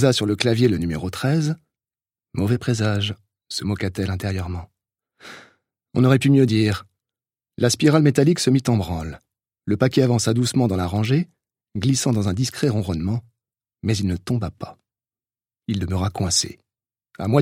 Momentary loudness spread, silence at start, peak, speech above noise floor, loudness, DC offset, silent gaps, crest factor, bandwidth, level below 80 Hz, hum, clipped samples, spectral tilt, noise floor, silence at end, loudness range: 15 LU; 0 s; 0 dBFS; over 70 dB; -21 LUFS; under 0.1%; none; 20 dB; 16 kHz; -48 dBFS; none; under 0.1%; -5.5 dB/octave; under -90 dBFS; 0 s; 7 LU